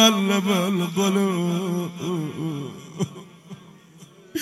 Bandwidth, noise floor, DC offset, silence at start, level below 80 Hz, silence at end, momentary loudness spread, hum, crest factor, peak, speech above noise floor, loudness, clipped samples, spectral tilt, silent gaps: 15.5 kHz; -48 dBFS; under 0.1%; 0 s; -68 dBFS; 0 s; 22 LU; none; 22 dB; -2 dBFS; 25 dB; -24 LUFS; under 0.1%; -4.5 dB/octave; none